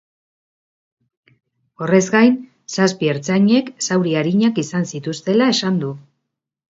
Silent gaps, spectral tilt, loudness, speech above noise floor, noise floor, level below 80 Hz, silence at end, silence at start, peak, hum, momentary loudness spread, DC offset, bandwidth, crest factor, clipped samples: none; -5 dB/octave; -17 LUFS; 61 dB; -78 dBFS; -64 dBFS; 0.75 s; 1.8 s; 0 dBFS; none; 11 LU; under 0.1%; 7.8 kHz; 18 dB; under 0.1%